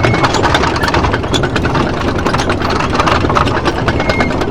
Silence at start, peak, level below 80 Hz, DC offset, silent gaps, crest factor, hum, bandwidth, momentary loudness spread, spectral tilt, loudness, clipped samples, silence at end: 0 s; 0 dBFS; -26 dBFS; under 0.1%; none; 12 dB; none; 16 kHz; 3 LU; -5.5 dB/octave; -13 LUFS; 0.1%; 0 s